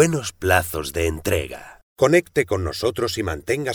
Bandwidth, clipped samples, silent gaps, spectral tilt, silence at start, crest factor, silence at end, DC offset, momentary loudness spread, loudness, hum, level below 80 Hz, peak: over 20 kHz; under 0.1%; 1.83-1.96 s; -4.5 dB/octave; 0 s; 18 dB; 0 s; under 0.1%; 8 LU; -21 LUFS; none; -40 dBFS; -2 dBFS